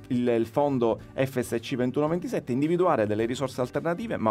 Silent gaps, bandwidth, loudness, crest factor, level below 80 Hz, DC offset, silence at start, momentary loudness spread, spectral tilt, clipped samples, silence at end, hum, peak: none; 15.5 kHz; -27 LUFS; 16 dB; -58 dBFS; under 0.1%; 0 s; 6 LU; -7 dB/octave; under 0.1%; 0 s; none; -10 dBFS